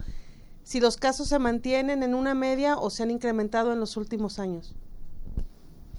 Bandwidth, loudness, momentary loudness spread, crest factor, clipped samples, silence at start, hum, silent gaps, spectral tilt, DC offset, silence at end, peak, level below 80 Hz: 12 kHz; -27 LUFS; 15 LU; 18 dB; under 0.1%; 0 s; none; none; -4.5 dB/octave; under 0.1%; 0 s; -10 dBFS; -40 dBFS